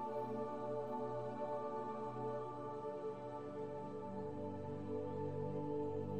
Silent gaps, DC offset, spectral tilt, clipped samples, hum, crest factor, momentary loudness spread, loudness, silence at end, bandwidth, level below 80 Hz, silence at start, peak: none; 0.1%; -9 dB/octave; under 0.1%; none; 12 dB; 4 LU; -45 LUFS; 0 s; 9.4 kHz; -78 dBFS; 0 s; -32 dBFS